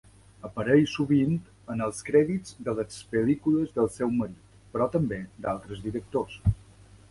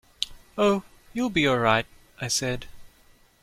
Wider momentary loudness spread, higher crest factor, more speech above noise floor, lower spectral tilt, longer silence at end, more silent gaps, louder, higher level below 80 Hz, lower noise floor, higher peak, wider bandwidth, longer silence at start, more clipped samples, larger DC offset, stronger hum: second, 11 LU vs 14 LU; about the same, 20 dB vs 22 dB; second, 26 dB vs 34 dB; first, -7 dB/octave vs -4 dB/octave; about the same, 0.55 s vs 0.55 s; neither; second, -28 LUFS vs -25 LUFS; about the same, -46 dBFS vs -50 dBFS; second, -53 dBFS vs -58 dBFS; about the same, -8 dBFS vs -6 dBFS; second, 11.5 kHz vs 16 kHz; first, 0.45 s vs 0.2 s; neither; neither; neither